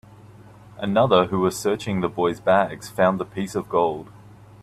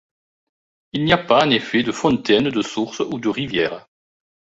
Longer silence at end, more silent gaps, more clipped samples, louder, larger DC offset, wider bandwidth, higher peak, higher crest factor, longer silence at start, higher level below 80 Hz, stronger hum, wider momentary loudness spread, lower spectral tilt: second, 0.35 s vs 0.8 s; neither; neither; second, -22 LUFS vs -19 LUFS; neither; first, 14 kHz vs 8 kHz; about the same, -4 dBFS vs -2 dBFS; about the same, 20 dB vs 20 dB; second, 0.25 s vs 0.95 s; about the same, -56 dBFS vs -52 dBFS; neither; about the same, 9 LU vs 9 LU; about the same, -5.5 dB/octave vs -5 dB/octave